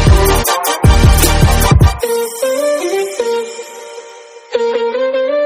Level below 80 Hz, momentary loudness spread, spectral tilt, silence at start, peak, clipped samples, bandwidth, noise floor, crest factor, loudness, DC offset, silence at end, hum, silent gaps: -18 dBFS; 16 LU; -5 dB/octave; 0 s; 0 dBFS; 0.6%; 19 kHz; -35 dBFS; 12 dB; -13 LUFS; under 0.1%; 0 s; none; none